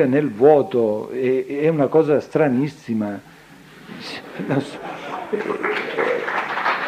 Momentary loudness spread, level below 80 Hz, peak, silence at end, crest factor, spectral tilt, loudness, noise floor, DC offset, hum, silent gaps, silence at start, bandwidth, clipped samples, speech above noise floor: 16 LU; -66 dBFS; -2 dBFS; 0 s; 18 dB; -7 dB/octave; -20 LUFS; -44 dBFS; under 0.1%; none; none; 0 s; 14 kHz; under 0.1%; 25 dB